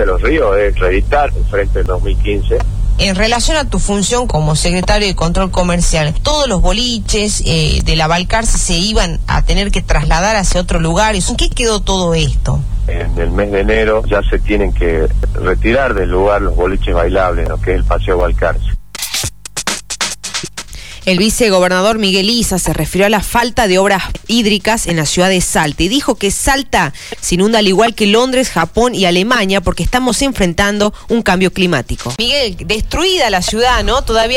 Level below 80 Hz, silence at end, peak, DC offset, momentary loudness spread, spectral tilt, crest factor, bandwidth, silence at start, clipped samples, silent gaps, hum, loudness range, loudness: -18 dBFS; 0 s; 0 dBFS; 2%; 6 LU; -4 dB/octave; 12 dB; 16 kHz; 0 s; under 0.1%; none; none; 3 LU; -13 LUFS